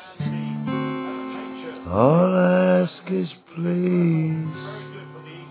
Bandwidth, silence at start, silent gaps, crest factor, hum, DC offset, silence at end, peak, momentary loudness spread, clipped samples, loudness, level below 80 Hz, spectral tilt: 4 kHz; 0 s; none; 20 dB; none; under 0.1%; 0 s; -2 dBFS; 18 LU; under 0.1%; -22 LUFS; -54 dBFS; -12 dB/octave